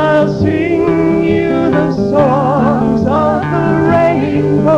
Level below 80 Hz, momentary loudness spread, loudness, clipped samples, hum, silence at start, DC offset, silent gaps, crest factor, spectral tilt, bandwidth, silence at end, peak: -36 dBFS; 2 LU; -12 LUFS; under 0.1%; none; 0 s; under 0.1%; none; 12 dB; -8.5 dB/octave; 8.4 kHz; 0 s; 0 dBFS